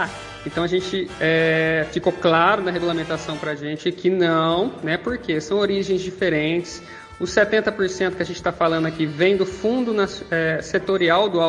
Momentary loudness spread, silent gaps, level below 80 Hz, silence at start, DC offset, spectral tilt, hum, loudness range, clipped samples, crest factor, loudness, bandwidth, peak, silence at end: 9 LU; none; -50 dBFS; 0 s; under 0.1%; -5.5 dB/octave; none; 2 LU; under 0.1%; 18 dB; -21 LUFS; 11 kHz; -4 dBFS; 0 s